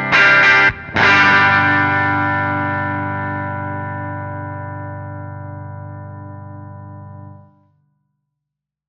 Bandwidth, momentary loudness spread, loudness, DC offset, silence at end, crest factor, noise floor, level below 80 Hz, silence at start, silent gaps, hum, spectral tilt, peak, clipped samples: 8 kHz; 24 LU; -14 LUFS; under 0.1%; 1.5 s; 18 dB; -81 dBFS; -52 dBFS; 0 s; none; 50 Hz at -60 dBFS; -5 dB/octave; 0 dBFS; under 0.1%